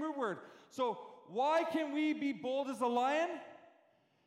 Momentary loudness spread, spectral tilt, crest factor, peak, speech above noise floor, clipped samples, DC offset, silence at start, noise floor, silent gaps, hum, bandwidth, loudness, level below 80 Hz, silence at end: 15 LU; -4.5 dB/octave; 14 dB; -22 dBFS; 36 dB; under 0.1%; under 0.1%; 0 s; -71 dBFS; none; none; 14.5 kHz; -36 LUFS; under -90 dBFS; 0.7 s